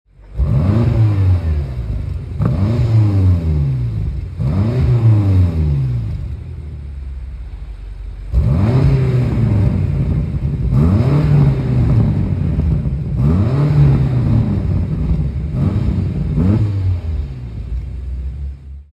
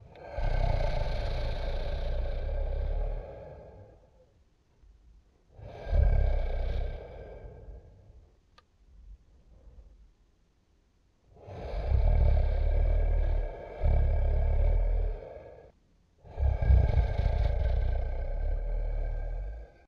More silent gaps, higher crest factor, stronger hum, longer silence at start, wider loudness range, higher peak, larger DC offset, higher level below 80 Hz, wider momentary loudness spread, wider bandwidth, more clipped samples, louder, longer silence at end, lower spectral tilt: neither; second, 12 dB vs 18 dB; neither; about the same, 0.25 s vs 0.15 s; second, 5 LU vs 12 LU; first, -2 dBFS vs -12 dBFS; neither; first, -24 dBFS vs -30 dBFS; second, 16 LU vs 20 LU; about the same, 5.6 kHz vs 5.2 kHz; neither; first, -16 LUFS vs -32 LUFS; about the same, 0.1 s vs 0.2 s; first, -10 dB/octave vs -8.5 dB/octave